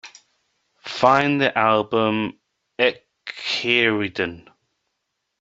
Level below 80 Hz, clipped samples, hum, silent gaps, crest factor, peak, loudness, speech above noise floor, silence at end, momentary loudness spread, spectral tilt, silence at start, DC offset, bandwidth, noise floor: -64 dBFS; under 0.1%; none; none; 20 dB; -2 dBFS; -20 LUFS; 58 dB; 1 s; 17 LU; -5 dB/octave; 0.05 s; under 0.1%; 8 kHz; -77 dBFS